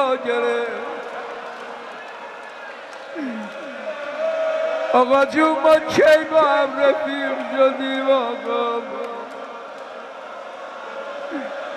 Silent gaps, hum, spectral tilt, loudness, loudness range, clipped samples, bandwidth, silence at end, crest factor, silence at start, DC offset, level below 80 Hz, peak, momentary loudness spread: none; none; -4 dB/octave; -20 LUFS; 13 LU; under 0.1%; 14 kHz; 0 s; 18 dB; 0 s; under 0.1%; -66 dBFS; -4 dBFS; 19 LU